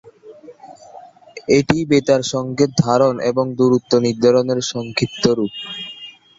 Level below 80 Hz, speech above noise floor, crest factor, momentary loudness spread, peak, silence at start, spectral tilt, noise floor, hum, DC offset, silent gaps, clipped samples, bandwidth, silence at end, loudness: -52 dBFS; 25 dB; 16 dB; 13 LU; -2 dBFS; 0.05 s; -5.5 dB/octave; -41 dBFS; none; under 0.1%; none; under 0.1%; 8 kHz; 0.3 s; -17 LUFS